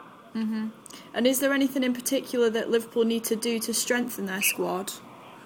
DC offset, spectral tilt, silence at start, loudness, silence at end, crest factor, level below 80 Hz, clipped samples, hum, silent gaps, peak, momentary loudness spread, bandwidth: under 0.1%; -3 dB/octave; 0 s; -26 LUFS; 0 s; 18 dB; -72 dBFS; under 0.1%; none; none; -10 dBFS; 13 LU; 19.5 kHz